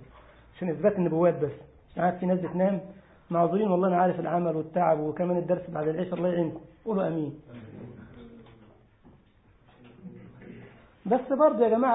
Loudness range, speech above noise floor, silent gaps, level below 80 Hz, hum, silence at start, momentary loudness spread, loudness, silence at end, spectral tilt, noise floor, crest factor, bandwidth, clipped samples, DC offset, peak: 11 LU; 34 dB; none; -62 dBFS; none; 0 s; 24 LU; -27 LUFS; 0 s; -12 dB/octave; -60 dBFS; 18 dB; 4 kHz; under 0.1%; under 0.1%; -10 dBFS